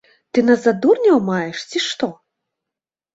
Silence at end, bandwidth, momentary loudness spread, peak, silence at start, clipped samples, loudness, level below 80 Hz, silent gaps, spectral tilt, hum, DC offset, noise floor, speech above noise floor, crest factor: 1 s; 8 kHz; 9 LU; -2 dBFS; 0.35 s; under 0.1%; -17 LUFS; -64 dBFS; none; -5 dB/octave; none; under 0.1%; -86 dBFS; 70 dB; 16 dB